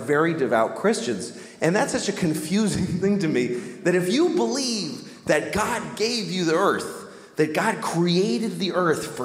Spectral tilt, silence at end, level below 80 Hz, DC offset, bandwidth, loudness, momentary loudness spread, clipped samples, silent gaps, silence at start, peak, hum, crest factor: -4.5 dB/octave; 0 s; -56 dBFS; under 0.1%; 16 kHz; -23 LUFS; 7 LU; under 0.1%; none; 0 s; -6 dBFS; none; 18 dB